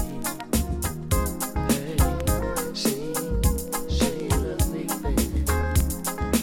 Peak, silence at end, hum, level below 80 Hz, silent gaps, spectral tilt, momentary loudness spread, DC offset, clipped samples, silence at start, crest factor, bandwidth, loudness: -8 dBFS; 0 s; none; -30 dBFS; none; -5 dB/octave; 5 LU; under 0.1%; under 0.1%; 0 s; 16 dB; 17 kHz; -26 LUFS